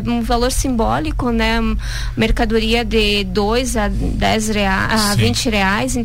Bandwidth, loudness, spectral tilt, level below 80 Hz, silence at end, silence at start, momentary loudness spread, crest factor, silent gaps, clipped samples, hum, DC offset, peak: 16.5 kHz; -17 LUFS; -4.5 dB/octave; -24 dBFS; 0 s; 0 s; 4 LU; 12 dB; none; under 0.1%; none; 2%; -4 dBFS